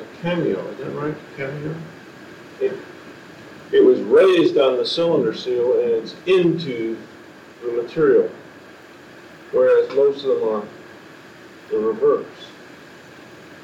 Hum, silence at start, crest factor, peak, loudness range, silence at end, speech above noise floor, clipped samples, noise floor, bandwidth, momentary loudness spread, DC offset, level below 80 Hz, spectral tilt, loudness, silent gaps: none; 0 s; 16 dB; -4 dBFS; 8 LU; 0 s; 24 dB; under 0.1%; -43 dBFS; 9.4 kHz; 25 LU; under 0.1%; -64 dBFS; -6.5 dB/octave; -19 LUFS; none